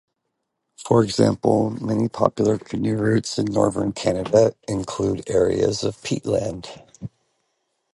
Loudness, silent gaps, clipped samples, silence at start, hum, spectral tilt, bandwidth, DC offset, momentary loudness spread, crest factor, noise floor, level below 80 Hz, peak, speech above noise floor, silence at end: -21 LUFS; none; under 0.1%; 0.8 s; none; -6 dB/octave; 11.5 kHz; under 0.1%; 15 LU; 20 dB; -77 dBFS; -50 dBFS; 0 dBFS; 57 dB; 0.85 s